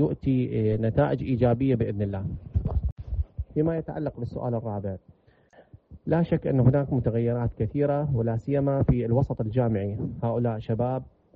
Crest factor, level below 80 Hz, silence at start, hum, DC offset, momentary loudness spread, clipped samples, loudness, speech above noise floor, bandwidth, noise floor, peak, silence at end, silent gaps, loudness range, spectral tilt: 18 dB; -40 dBFS; 0 s; none; under 0.1%; 10 LU; under 0.1%; -26 LUFS; 32 dB; 4.6 kHz; -57 dBFS; -8 dBFS; 0.25 s; 2.92-2.96 s; 6 LU; -9.5 dB/octave